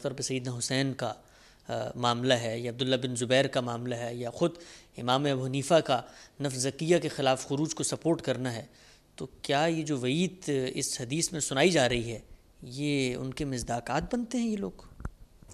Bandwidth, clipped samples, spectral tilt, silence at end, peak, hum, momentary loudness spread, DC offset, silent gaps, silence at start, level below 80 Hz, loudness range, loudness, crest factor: 14.5 kHz; under 0.1%; -4.5 dB/octave; 0 s; -10 dBFS; none; 14 LU; under 0.1%; none; 0 s; -56 dBFS; 2 LU; -30 LUFS; 20 dB